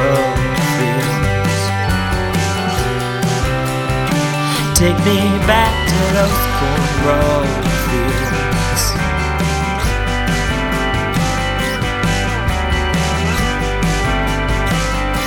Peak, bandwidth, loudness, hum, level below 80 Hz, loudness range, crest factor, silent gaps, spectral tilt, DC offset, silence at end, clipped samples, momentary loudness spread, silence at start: 0 dBFS; 19 kHz; -16 LUFS; none; -24 dBFS; 3 LU; 16 dB; none; -4.5 dB/octave; under 0.1%; 0 s; under 0.1%; 4 LU; 0 s